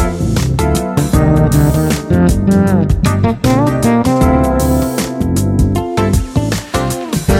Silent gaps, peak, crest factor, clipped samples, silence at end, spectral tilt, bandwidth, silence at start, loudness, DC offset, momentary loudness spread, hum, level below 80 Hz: none; 0 dBFS; 12 dB; under 0.1%; 0 s; -6.5 dB/octave; 17 kHz; 0 s; -13 LUFS; under 0.1%; 6 LU; none; -20 dBFS